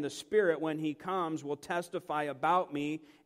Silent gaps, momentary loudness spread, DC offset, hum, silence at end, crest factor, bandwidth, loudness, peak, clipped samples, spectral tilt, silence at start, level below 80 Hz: none; 7 LU; under 0.1%; none; 0.2 s; 18 dB; 15.5 kHz; -33 LUFS; -16 dBFS; under 0.1%; -5.5 dB/octave; 0 s; -76 dBFS